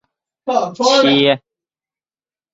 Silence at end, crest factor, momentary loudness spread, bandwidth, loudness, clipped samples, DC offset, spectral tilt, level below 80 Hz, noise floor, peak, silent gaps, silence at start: 1.15 s; 18 dB; 10 LU; 7.8 kHz; -14 LUFS; under 0.1%; under 0.1%; -4 dB/octave; -62 dBFS; under -90 dBFS; 0 dBFS; none; 0.45 s